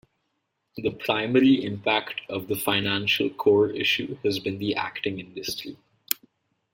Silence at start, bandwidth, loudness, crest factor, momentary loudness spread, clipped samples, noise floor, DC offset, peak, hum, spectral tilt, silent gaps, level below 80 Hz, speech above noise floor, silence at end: 0.75 s; 16.5 kHz; -25 LUFS; 26 dB; 11 LU; under 0.1%; -77 dBFS; under 0.1%; 0 dBFS; none; -4.5 dB/octave; none; -64 dBFS; 52 dB; 0.6 s